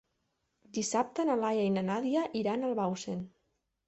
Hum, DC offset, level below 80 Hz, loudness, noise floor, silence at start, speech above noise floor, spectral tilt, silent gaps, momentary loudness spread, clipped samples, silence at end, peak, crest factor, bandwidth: none; under 0.1%; -72 dBFS; -32 LUFS; -80 dBFS; 0.75 s; 48 dB; -5 dB/octave; none; 10 LU; under 0.1%; 0.6 s; -16 dBFS; 16 dB; 8.4 kHz